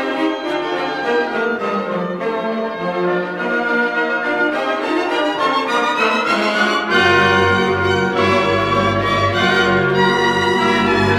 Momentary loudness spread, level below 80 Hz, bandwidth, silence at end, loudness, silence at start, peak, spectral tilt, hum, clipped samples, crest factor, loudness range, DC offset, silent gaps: 7 LU; -46 dBFS; 14 kHz; 0 s; -16 LUFS; 0 s; -2 dBFS; -5 dB/octave; none; under 0.1%; 14 dB; 5 LU; under 0.1%; none